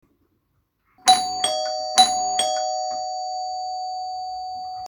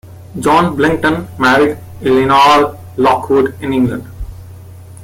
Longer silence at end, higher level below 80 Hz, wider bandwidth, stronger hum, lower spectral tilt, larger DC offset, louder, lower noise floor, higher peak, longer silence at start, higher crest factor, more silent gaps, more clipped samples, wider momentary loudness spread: about the same, 0 s vs 0 s; second, -66 dBFS vs -38 dBFS; first, 19 kHz vs 16.5 kHz; neither; second, 0.5 dB/octave vs -5.5 dB/octave; neither; second, -22 LUFS vs -12 LUFS; first, -70 dBFS vs -33 dBFS; about the same, 0 dBFS vs 0 dBFS; first, 1.05 s vs 0.05 s; first, 24 dB vs 14 dB; neither; neither; second, 13 LU vs 16 LU